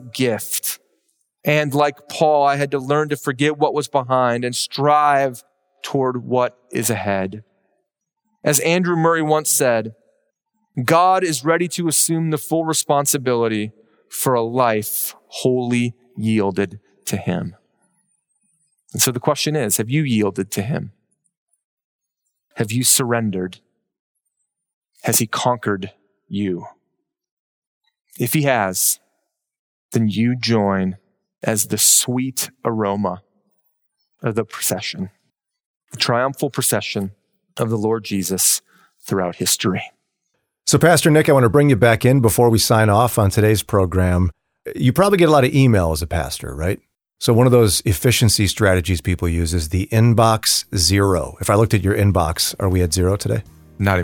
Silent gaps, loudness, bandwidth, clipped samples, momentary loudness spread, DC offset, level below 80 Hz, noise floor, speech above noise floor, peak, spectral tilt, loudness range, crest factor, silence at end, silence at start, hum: 21.37-21.47 s, 21.64-21.77 s, 21.84-21.99 s, 23.99-24.15 s, 24.74-24.82 s, 27.31-27.81 s, 29.59-29.89 s, 35.66-35.81 s; -18 LUFS; over 20 kHz; under 0.1%; 12 LU; under 0.1%; -42 dBFS; -77 dBFS; 59 dB; -2 dBFS; -4.5 dB/octave; 8 LU; 18 dB; 0 s; 0 s; none